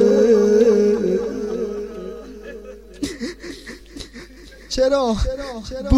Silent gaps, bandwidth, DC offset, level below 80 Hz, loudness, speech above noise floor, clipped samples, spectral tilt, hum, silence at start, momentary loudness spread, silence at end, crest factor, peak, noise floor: none; 12.5 kHz; 0.1%; -36 dBFS; -19 LUFS; 23 dB; under 0.1%; -6 dB/octave; none; 0 s; 22 LU; 0 s; 18 dB; -2 dBFS; -41 dBFS